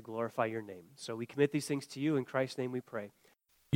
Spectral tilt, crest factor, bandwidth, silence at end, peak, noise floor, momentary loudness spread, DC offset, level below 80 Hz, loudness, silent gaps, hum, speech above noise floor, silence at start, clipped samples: -6 dB/octave; 22 dB; 16.5 kHz; 0 s; -14 dBFS; -70 dBFS; 12 LU; under 0.1%; -80 dBFS; -36 LUFS; none; none; 34 dB; 0 s; under 0.1%